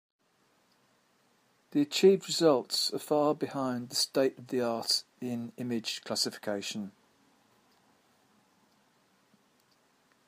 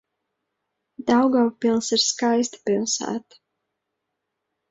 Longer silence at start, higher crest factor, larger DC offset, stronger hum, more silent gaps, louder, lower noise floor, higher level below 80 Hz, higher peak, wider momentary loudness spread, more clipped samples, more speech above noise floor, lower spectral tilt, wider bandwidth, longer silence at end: first, 1.75 s vs 1 s; about the same, 20 dB vs 16 dB; neither; neither; neither; second, -30 LUFS vs -21 LUFS; second, -70 dBFS vs -80 dBFS; second, -84 dBFS vs -68 dBFS; second, -12 dBFS vs -8 dBFS; first, 13 LU vs 10 LU; neither; second, 40 dB vs 59 dB; about the same, -3.5 dB/octave vs -3 dB/octave; first, 15.5 kHz vs 8 kHz; first, 3.4 s vs 1.5 s